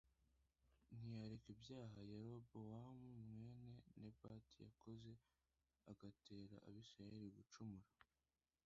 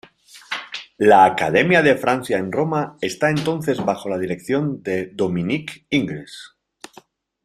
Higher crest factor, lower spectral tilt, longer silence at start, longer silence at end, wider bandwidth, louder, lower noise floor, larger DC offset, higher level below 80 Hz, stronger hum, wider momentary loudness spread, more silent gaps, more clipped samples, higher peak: about the same, 16 dB vs 18 dB; first, -7.5 dB/octave vs -5.5 dB/octave; second, 0.05 s vs 0.35 s; second, 0.6 s vs 1 s; second, 7.6 kHz vs 15 kHz; second, -60 LUFS vs -19 LUFS; first, under -90 dBFS vs -50 dBFS; neither; second, -80 dBFS vs -58 dBFS; neither; second, 7 LU vs 14 LU; neither; neither; second, -44 dBFS vs -2 dBFS